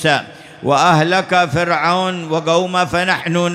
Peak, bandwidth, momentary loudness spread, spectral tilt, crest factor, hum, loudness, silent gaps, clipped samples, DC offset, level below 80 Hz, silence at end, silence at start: -2 dBFS; 14.5 kHz; 7 LU; -4.5 dB/octave; 14 dB; none; -15 LUFS; none; under 0.1%; under 0.1%; -50 dBFS; 0 s; 0 s